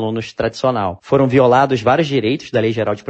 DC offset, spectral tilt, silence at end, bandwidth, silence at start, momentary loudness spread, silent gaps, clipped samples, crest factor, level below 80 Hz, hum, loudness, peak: under 0.1%; -7 dB/octave; 0.1 s; 8.4 kHz; 0 s; 9 LU; none; under 0.1%; 14 dB; -50 dBFS; none; -16 LUFS; 0 dBFS